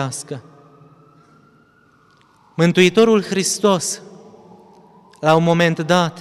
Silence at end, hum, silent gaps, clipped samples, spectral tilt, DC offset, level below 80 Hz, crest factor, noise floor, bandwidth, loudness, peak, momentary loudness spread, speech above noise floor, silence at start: 0 s; none; none; under 0.1%; -4.5 dB/octave; under 0.1%; -62 dBFS; 18 dB; -54 dBFS; 14 kHz; -16 LUFS; -2 dBFS; 17 LU; 38 dB; 0 s